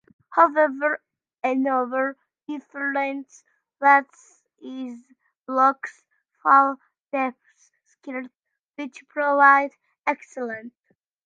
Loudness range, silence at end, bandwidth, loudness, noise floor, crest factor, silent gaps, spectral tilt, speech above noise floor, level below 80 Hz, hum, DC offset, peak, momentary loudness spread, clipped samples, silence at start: 3 LU; 0.55 s; 7.8 kHz; -21 LUFS; -64 dBFS; 22 dB; 5.37-5.43 s, 6.99-7.04 s, 8.59-8.69 s; -4 dB/octave; 42 dB; -84 dBFS; none; under 0.1%; -2 dBFS; 19 LU; under 0.1%; 0.3 s